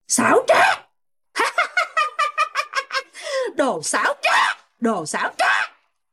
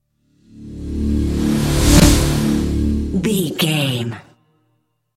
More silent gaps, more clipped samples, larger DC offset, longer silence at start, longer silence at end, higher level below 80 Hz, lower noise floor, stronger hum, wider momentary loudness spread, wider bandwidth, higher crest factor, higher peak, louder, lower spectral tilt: neither; neither; neither; second, 0.1 s vs 0.55 s; second, 0.45 s vs 0.95 s; second, -70 dBFS vs -24 dBFS; about the same, -69 dBFS vs -66 dBFS; neither; second, 10 LU vs 17 LU; about the same, 15.5 kHz vs 16.5 kHz; about the same, 16 dB vs 18 dB; second, -4 dBFS vs 0 dBFS; second, -20 LUFS vs -17 LUFS; second, -1.5 dB/octave vs -5 dB/octave